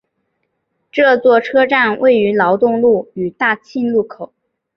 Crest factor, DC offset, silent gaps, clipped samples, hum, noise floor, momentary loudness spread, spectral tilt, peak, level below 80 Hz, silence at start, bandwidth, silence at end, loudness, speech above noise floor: 14 dB; under 0.1%; none; under 0.1%; none; -69 dBFS; 12 LU; -7 dB/octave; -2 dBFS; -60 dBFS; 0.95 s; 6.4 kHz; 0.5 s; -14 LUFS; 56 dB